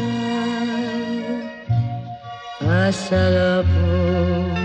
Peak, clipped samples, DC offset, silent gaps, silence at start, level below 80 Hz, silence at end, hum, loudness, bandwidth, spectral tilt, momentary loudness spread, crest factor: -6 dBFS; under 0.1%; under 0.1%; none; 0 s; -36 dBFS; 0 s; none; -20 LUFS; 9.2 kHz; -7 dB/octave; 11 LU; 14 dB